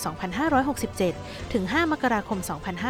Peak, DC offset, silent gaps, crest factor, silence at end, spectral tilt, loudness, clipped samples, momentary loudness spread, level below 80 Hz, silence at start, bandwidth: -10 dBFS; under 0.1%; none; 16 dB; 0 s; -5 dB/octave; -26 LUFS; under 0.1%; 7 LU; -48 dBFS; 0 s; 17.5 kHz